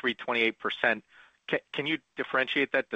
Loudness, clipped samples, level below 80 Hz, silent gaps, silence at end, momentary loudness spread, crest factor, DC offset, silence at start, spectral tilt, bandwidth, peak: -29 LUFS; under 0.1%; -76 dBFS; none; 0 s; 7 LU; 20 dB; under 0.1%; 0.05 s; -5 dB/octave; 8.6 kHz; -10 dBFS